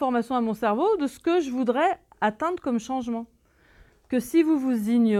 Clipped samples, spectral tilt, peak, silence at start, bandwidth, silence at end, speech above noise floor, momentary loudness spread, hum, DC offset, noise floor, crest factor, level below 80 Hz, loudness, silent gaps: under 0.1%; -6 dB/octave; -10 dBFS; 0 s; 14.5 kHz; 0 s; 33 dB; 7 LU; none; under 0.1%; -57 dBFS; 14 dB; -62 dBFS; -25 LUFS; none